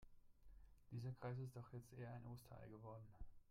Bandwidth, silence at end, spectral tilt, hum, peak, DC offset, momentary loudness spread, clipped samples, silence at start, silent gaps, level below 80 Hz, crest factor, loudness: 16 kHz; 0 s; -8 dB/octave; none; -40 dBFS; under 0.1%; 9 LU; under 0.1%; 0 s; none; -68 dBFS; 16 dB; -56 LUFS